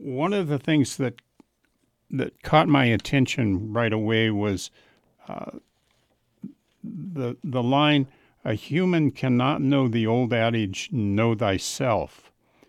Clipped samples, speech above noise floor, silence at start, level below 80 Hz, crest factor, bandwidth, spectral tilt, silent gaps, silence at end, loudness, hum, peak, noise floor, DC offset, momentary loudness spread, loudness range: under 0.1%; 47 dB; 0 s; -56 dBFS; 18 dB; 14 kHz; -6 dB/octave; none; 0.6 s; -24 LUFS; none; -6 dBFS; -70 dBFS; under 0.1%; 17 LU; 6 LU